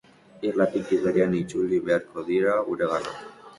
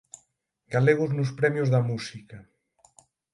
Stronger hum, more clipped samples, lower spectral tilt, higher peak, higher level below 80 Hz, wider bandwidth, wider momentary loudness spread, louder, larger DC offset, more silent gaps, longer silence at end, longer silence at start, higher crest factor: neither; neither; about the same, -7 dB/octave vs -7 dB/octave; about the same, -8 dBFS vs -6 dBFS; first, -60 dBFS vs -66 dBFS; about the same, 11.5 kHz vs 11.5 kHz; second, 7 LU vs 13 LU; about the same, -25 LUFS vs -25 LUFS; neither; neither; second, 0.05 s vs 0.9 s; second, 0.35 s vs 0.7 s; about the same, 18 dB vs 22 dB